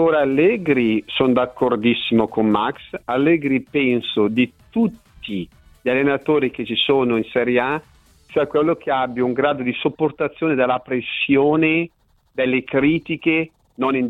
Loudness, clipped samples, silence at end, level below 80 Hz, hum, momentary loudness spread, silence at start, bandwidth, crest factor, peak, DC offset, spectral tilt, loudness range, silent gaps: -19 LUFS; under 0.1%; 0 s; -54 dBFS; none; 8 LU; 0 s; 4.6 kHz; 14 dB; -4 dBFS; under 0.1%; -7.5 dB/octave; 2 LU; none